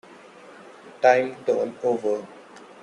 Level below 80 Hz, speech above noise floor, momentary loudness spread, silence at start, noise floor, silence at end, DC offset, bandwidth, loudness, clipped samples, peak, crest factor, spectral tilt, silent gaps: -74 dBFS; 25 dB; 10 LU; 0.1 s; -47 dBFS; 0.25 s; under 0.1%; 10.5 kHz; -23 LUFS; under 0.1%; -4 dBFS; 22 dB; -5 dB/octave; none